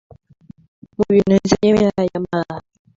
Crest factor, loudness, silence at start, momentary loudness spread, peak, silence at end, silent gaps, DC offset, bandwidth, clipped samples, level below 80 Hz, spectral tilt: 16 dB; -17 LUFS; 1 s; 15 LU; -2 dBFS; 0.4 s; none; under 0.1%; 7.8 kHz; under 0.1%; -46 dBFS; -6.5 dB/octave